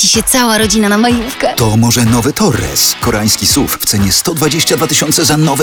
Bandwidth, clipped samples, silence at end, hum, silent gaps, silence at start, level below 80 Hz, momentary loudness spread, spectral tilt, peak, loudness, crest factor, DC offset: over 20 kHz; under 0.1%; 0 s; none; none; 0 s; -32 dBFS; 4 LU; -3.5 dB/octave; 0 dBFS; -10 LUFS; 10 dB; under 0.1%